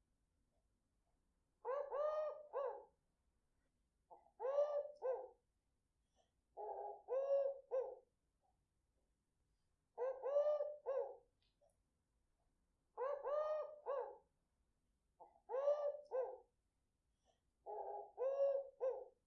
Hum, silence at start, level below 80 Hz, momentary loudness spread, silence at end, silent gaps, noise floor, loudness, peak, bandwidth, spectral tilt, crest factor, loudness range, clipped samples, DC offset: none; 1.65 s; -86 dBFS; 14 LU; 0.15 s; none; -87 dBFS; -44 LUFS; -28 dBFS; 6.2 kHz; -1.5 dB/octave; 18 dB; 3 LU; under 0.1%; under 0.1%